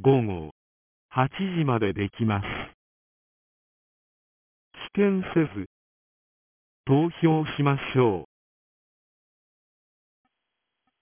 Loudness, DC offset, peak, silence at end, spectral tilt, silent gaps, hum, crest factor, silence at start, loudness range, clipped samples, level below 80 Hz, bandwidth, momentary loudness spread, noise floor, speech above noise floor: -25 LUFS; under 0.1%; -8 dBFS; 2.75 s; -11.5 dB/octave; 0.51-1.09 s, 2.74-4.71 s, 5.66-6.84 s; none; 20 dB; 0 s; 5 LU; under 0.1%; -54 dBFS; 3.6 kHz; 15 LU; -83 dBFS; 59 dB